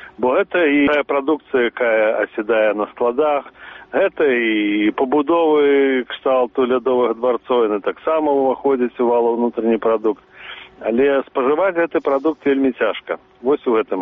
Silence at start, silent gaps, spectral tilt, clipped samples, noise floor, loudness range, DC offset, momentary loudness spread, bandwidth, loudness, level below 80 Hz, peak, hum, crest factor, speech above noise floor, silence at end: 0 s; none; -2.5 dB/octave; under 0.1%; -37 dBFS; 2 LU; under 0.1%; 6 LU; 3.9 kHz; -18 LUFS; -58 dBFS; -6 dBFS; none; 10 dB; 20 dB; 0 s